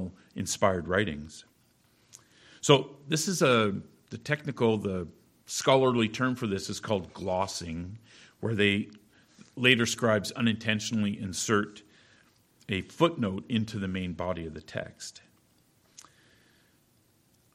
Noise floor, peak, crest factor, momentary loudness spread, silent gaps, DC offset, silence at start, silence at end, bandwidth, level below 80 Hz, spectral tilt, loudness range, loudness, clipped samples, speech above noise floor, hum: -66 dBFS; -4 dBFS; 26 dB; 17 LU; none; under 0.1%; 0 s; 2.35 s; 16 kHz; -60 dBFS; -4.5 dB/octave; 7 LU; -28 LUFS; under 0.1%; 38 dB; none